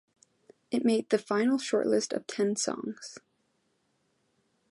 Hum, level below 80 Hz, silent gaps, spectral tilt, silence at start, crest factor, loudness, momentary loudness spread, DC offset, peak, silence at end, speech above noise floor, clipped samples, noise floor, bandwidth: none; -82 dBFS; none; -4 dB/octave; 0.7 s; 20 dB; -29 LUFS; 11 LU; under 0.1%; -12 dBFS; 1.5 s; 46 dB; under 0.1%; -74 dBFS; 11.5 kHz